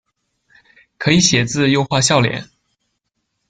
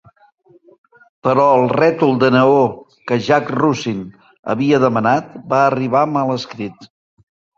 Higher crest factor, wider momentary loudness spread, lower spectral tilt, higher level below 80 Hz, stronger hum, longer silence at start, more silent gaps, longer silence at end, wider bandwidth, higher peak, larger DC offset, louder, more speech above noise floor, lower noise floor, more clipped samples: about the same, 18 dB vs 16 dB; second, 9 LU vs 15 LU; second, -4 dB/octave vs -7 dB/octave; first, -50 dBFS vs -56 dBFS; neither; second, 1 s vs 1.25 s; second, none vs 4.39-4.43 s; first, 1.05 s vs 0.7 s; first, 10 kHz vs 7.6 kHz; about the same, 0 dBFS vs 0 dBFS; neither; about the same, -15 LUFS vs -15 LUFS; first, 57 dB vs 36 dB; first, -72 dBFS vs -51 dBFS; neither